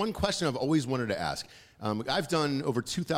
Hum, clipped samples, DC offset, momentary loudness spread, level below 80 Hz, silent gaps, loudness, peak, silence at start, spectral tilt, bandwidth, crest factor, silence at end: none; under 0.1%; under 0.1%; 8 LU; -54 dBFS; none; -30 LUFS; -14 dBFS; 0 s; -5 dB/octave; 16 kHz; 16 dB; 0 s